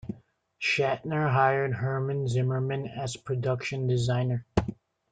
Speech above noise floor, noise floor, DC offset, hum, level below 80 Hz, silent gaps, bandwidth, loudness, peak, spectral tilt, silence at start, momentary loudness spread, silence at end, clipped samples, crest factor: 28 dB; -55 dBFS; under 0.1%; none; -52 dBFS; none; 9.2 kHz; -28 LUFS; -6 dBFS; -6.5 dB/octave; 0.05 s; 10 LU; 0.4 s; under 0.1%; 22 dB